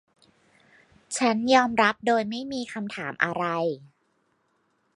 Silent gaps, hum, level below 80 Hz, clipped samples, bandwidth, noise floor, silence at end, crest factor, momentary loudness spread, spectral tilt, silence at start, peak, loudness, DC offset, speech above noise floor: none; none; -68 dBFS; under 0.1%; 11.5 kHz; -70 dBFS; 1.1 s; 22 dB; 13 LU; -4 dB/octave; 1.1 s; -4 dBFS; -25 LUFS; under 0.1%; 46 dB